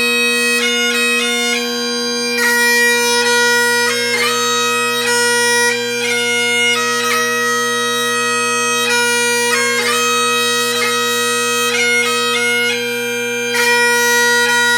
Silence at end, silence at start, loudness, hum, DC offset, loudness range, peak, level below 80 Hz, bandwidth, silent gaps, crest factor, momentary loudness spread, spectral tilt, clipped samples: 0 s; 0 s; -13 LUFS; none; under 0.1%; 1 LU; 0 dBFS; -68 dBFS; over 20 kHz; none; 14 dB; 5 LU; -0.5 dB/octave; under 0.1%